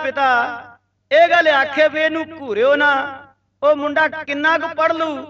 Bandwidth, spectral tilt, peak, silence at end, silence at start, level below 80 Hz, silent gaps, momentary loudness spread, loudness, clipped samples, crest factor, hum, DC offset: 7.4 kHz; -4 dB/octave; -2 dBFS; 0 s; 0 s; -64 dBFS; none; 10 LU; -16 LUFS; under 0.1%; 14 dB; none; under 0.1%